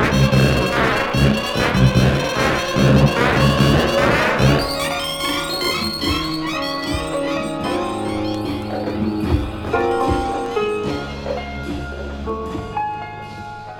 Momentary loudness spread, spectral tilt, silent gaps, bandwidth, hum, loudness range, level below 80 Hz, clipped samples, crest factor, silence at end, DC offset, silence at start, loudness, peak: 11 LU; -5.5 dB/octave; none; 19 kHz; none; 7 LU; -30 dBFS; under 0.1%; 18 dB; 0 s; under 0.1%; 0 s; -19 LUFS; 0 dBFS